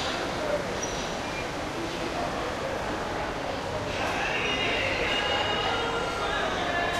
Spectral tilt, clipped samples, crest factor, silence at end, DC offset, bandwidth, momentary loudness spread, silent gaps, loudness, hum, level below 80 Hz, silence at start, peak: -3.5 dB/octave; under 0.1%; 14 dB; 0 s; under 0.1%; 15 kHz; 6 LU; none; -28 LUFS; none; -46 dBFS; 0 s; -16 dBFS